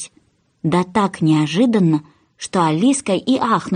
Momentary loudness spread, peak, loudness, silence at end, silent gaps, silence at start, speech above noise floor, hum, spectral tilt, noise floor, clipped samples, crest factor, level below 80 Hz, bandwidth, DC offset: 8 LU; -4 dBFS; -17 LUFS; 0 s; none; 0 s; 42 dB; none; -6 dB/octave; -58 dBFS; under 0.1%; 14 dB; -58 dBFS; 10 kHz; under 0.1%